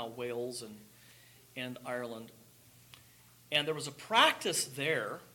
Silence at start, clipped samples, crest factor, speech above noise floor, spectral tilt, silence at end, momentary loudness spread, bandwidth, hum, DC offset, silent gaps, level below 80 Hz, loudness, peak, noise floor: 0 s; under 0.1%; 26 dB; 26 dB; -2 dB/octave; 0.05 s; 22 LU; 17.5 kHz; none; under 0.1%; none; -78 dBFS; -33 LUFS; -10 dBFS; -61 dBFS